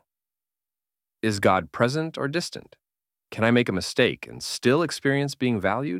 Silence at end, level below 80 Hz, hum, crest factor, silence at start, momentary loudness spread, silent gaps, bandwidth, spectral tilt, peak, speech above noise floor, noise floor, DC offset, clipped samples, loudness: 0 s; -60 dBFS; none; 20 dB; 1.25 s; 10 LU; none; 16 kHz; -5 dB/octave; -4 dBFS; over 66 dB; under -90 dBFS; under 0.1%; under 0.1%; -24 LUFS